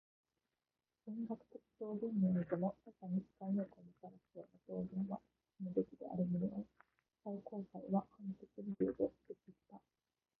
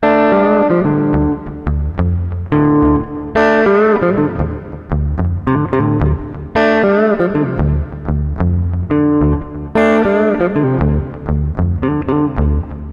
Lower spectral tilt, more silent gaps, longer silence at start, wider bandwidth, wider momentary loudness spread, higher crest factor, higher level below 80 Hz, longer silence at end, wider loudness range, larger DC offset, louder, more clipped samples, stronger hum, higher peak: first, -11.5 dB/octave vs -9.5 dB/octave; neither; first, 1.05 s vs 0 s; second, 2.6 kHz vs 7 kHz; first, 19 LU vs 9 LU; first, 20 dB vs 14 dB; second, -78 dBFS vs -24 dBFS; first, 0.6 s vs 0 s; about the same, 3 LU vs 1 LU; neither; second, -43 LUFS vs -15 LUFS; neither; neither; second, -24 dBFS vs 0 dBFS